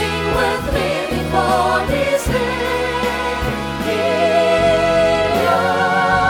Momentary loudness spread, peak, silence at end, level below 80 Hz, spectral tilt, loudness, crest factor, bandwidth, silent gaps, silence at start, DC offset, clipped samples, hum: 6 LU; -2 dBFS; 0 s; -32 dBFS; -5 dB/octave; -17 LUFS; 14 dB; 19 kHz; none; 0 s; under 0.1%; under 0.1%; none